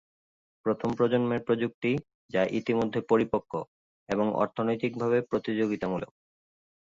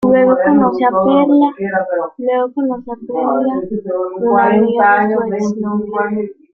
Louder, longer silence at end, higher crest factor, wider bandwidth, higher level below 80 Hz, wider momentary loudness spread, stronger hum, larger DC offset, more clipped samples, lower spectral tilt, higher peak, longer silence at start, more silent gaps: second, -29 LUFS vs -14 LUFS; first, 0.8 s vs 0.25 s; first, 18 dB vs 12 dB; about the same, 7.6 kHz vs 7 kHz; second, -62 dBFS vs -54 dBFS; about the same, 8 LU vs 9 LU; neither; neither; neither; about the same, -7.5 dB/octave vs -7.5 dB/octave; second, -10 dBFS vs -2 dBFS; first, 0.65 s vs 0 s; first, 1.74-1.82 s, 2.14-2.29 s, 3.68-4.07 s vs none